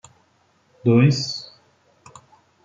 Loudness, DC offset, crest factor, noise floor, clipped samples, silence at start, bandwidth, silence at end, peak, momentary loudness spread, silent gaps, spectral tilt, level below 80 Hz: -20 LUFS; under 0.1%; 18 dB; -62 dBFS; under 0.1%; 0.85 s; 7.8 kHz; 1.2 s; -4 dBFS; 17 LU; none; -6.5 dB/octave; -66 dBFS